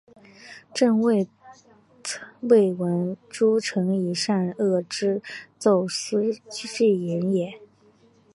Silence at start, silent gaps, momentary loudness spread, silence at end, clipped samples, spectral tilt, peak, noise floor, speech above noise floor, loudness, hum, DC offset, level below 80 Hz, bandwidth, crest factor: 0.4 s; none; 13 LU; 0.7 s; under 0.1%; -5.5 dB/octave; -6 dBFS; -58 dBFS; 35 dB; -24 LUFS; none; under 0.1%; -72 dBFS; 11.5 kHz; 18 dB